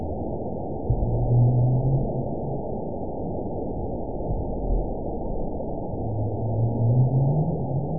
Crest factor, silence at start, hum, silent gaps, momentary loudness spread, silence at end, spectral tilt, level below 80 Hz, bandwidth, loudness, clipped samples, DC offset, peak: 14 dB; 0 s; none; none; 10 LU; 0 s; -19.5 dB/octave; -34 dBFS; 1 kHz; -26 LUFS; under 0.1%; 2%; -10 dBFS